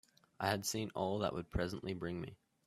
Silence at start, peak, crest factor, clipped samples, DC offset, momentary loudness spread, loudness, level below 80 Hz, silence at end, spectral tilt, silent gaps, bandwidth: 0.4 s; -20 dBFS; 22 dB; under 0.1%; under 0.1%; 7 LU; -40 LUFS; -58 dBFS; 0.3 s; -4.5 dB/octave; none; 15 kHz